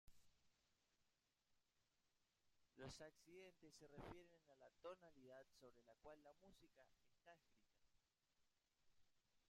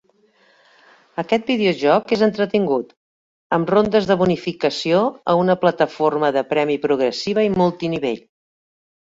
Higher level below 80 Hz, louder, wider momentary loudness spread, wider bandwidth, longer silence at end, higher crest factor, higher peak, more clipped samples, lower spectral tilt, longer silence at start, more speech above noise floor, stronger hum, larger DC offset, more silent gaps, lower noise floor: second, -82 dBFS vs -56 dBFS; second, -64 LUFS vs -19 LUFS; about the same, 7 LU vs 7 LU; first, 13 kHz vs 7.8 kHz; second, 0 s vs 0.85 s; about the same, 22 dB vs 18 dB; second, -48 dBFS vs -2 dBFS; neither; second, -4.5 dB/octave vs -6.5 dB/octave; second, 0.05 s vs 1.15 s; second, 22 dB vs 39 dB; neither; neither; second, none vs 2.97-3.50 s; first, -89 dBFS vs -57 dBFS